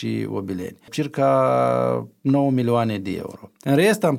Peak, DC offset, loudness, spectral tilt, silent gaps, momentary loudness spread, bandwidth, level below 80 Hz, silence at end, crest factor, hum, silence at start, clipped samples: -6 dBFS; under 0.1%; -21 LUFS; -6.5 dB/octave; none; 13 LU; 16 kHz; -62 dBFS; 0 s; 16 dB; none; 0 s; under 0.1%